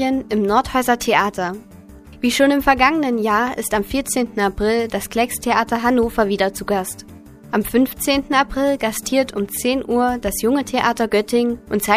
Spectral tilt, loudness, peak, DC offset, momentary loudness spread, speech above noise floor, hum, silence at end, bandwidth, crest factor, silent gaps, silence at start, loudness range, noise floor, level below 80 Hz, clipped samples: -4 dB/octave; -18 LUFS; 0 dBFS; under 0.1%; 7 LU; 22 dB; none; 0 s; 15.5 kHz; 18 dB; none; 0 s; 2 LU; -41 dBFS; -40 dBFS; under 0.1%